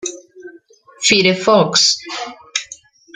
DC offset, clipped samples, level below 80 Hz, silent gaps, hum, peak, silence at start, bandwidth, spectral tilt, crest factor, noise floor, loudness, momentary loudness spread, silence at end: under 0.1%; under 0.1%; -58 dBFS; none; none; -2 dBFS; 0.05 s; 12 kHz; -2.5 dB/octave; 16 dB; -46 dBFS; -14 LUFS; 15 LU; 0.4 s